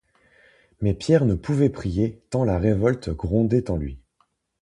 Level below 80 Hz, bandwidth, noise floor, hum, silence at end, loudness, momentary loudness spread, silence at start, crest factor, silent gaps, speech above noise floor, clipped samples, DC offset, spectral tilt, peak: -38 dBFS; 11 kHz; -68 dBFS; none; 0.65 s; -23 LUFS; 8 LU; 0.8 s; 18 dB; none; 47 dB; under 0.1%; under 0.1%; -8.5 dB/octave; -4 dBFS